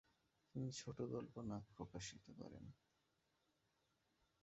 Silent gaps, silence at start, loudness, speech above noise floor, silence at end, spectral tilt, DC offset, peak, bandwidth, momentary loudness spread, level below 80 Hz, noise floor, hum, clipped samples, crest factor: none; 0.55 s; -52 LUFS; 34 dB; 1.65 s; -6 dB/octave; under 0.1%; -34 dBFS; 7.6 kHz; 10 LU; -74 dBFS; -85 dBFS; none; under 0.1%; 20 dB